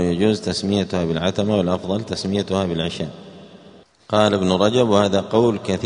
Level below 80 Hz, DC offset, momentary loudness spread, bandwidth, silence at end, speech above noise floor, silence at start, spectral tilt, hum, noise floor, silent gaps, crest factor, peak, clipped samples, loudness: -50 dBFS; under 0.1%; 8 LU; 10.5 kHz; 0 s; 28 dB; 0 s; -6 dB/octave; none; -47 dBFS; none; 20 dB; 0 dBFS; under 0.1%; -20 LUFS